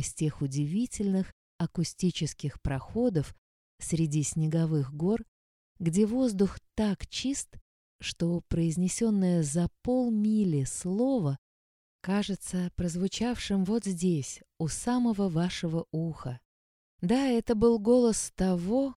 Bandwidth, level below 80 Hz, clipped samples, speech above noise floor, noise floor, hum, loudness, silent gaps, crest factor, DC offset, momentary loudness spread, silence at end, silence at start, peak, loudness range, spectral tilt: 13.5 kHz; -50 dBFS; under 0.1%; over 62 dB; under -90 dBFS; none; -29 LUFS; 1.33-1.59 s, 3.38-3.78 s, 5.28-5.75 s, 7.61-7.99 s, 11.38-11.99 s, 16.45-16.98 s; 18 dB; under 0.1%; 9 LU; 0.05 s; 0 s; -12 dBFS; 3 LU; -6 dB/octave